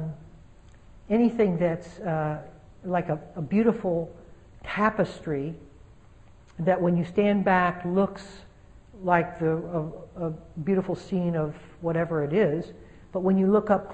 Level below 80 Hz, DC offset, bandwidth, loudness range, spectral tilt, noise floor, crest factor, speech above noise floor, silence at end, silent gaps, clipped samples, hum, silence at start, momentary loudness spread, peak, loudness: -52 dBFS; 0.1%; 8.4 kHz; 3 LU; -8.5 dB/octave; -53 dBFS; 20 dB; 27 dB; 0 s; none; under 0.1%; none; 0 s; 14 LU; -8 dBFS; -26 LUFS